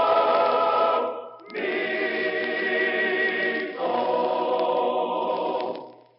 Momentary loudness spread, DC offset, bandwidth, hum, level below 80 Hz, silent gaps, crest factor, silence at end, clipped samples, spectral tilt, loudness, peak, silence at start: 9 LU; under 0.1%; 5.6 kHz; none; under -90 dBFS; none; 14 dB; 0.25 s; under 0.1%; -0.5 dB/octave; -24 LUFS; -10 dBFS; 0 s